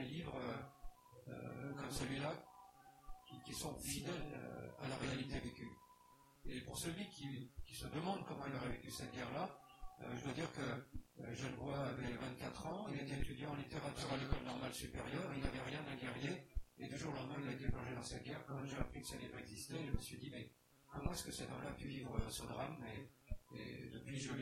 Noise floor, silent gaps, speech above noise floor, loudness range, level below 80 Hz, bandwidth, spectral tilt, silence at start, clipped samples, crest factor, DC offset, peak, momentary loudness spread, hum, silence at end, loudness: -68 dBFS; none; 22 dB; 3 LU; -56 dBFS; 16.5 kHz; -5 dB/octave; 0 s; under 0.1%; 22 dB; under 0.1%; -24 dBFS; 11 LU; none; 0 s; -47 LUFS